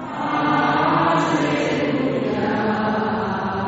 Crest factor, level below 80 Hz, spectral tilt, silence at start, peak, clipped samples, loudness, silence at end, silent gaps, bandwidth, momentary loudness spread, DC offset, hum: 14 dB; -54 dBFS; -4.5 dB/octave; 0 s; -6 dBFS; under 0.1%; -20 LUFS; 0 s; none; 8 kHz; 5 LU; under 0.1%; none